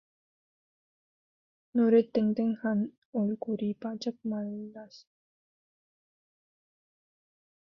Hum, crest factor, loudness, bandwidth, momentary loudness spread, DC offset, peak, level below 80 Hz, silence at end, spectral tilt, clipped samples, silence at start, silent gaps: none; 20 dB; -30 LUFS; 6.6 kHz; 14 LU; under 0.1%; -12 dBFS; -76 dBFS; 2.8 s; -8 dB/octave; under 0.1%; 1.75 s; 2.98-3.13 s